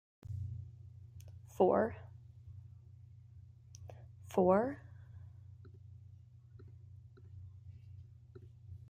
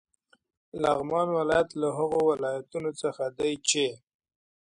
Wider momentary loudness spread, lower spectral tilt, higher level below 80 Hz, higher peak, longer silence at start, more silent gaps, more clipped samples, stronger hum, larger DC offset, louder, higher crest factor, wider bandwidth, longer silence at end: first, 27 LU vs 7 LU; first, -8.5 dB/octave vs -3.5 dB/octave; second, -68 dBFS vs -62 dBFS; second, -16 dBFS vs -10 dBFS; second, 0.3 s vs 0.75 s; neither; neither; neither; neither; second, -34 LUFS vs -28 LUFS; first, 26 dB vs 18 dB; first, 15.5 kHz vs 11 kHz; second, 0.15 s vs 0.8 s